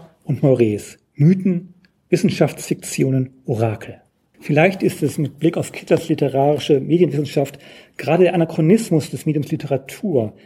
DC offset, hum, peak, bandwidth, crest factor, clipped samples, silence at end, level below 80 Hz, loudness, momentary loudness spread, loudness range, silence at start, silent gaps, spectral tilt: under 0.1%; none; -2 dBFS; 15.5 kHz; 16 dB; under 0.1%; 0.15 s; -60 dBFS; -19 LUFS; 11 LU; 3 LU; 0 s; none; -7 dB/octave